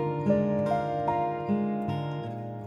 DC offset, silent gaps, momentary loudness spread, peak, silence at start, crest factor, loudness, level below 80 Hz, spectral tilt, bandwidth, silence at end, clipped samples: under 0.1%; none; 8 LU; -12 dBFS; 0 s; 16 dB; -29 LUFS; -58 dBFS; -9 dB/octave; 9.4 kHz; 0 s; under 0.1%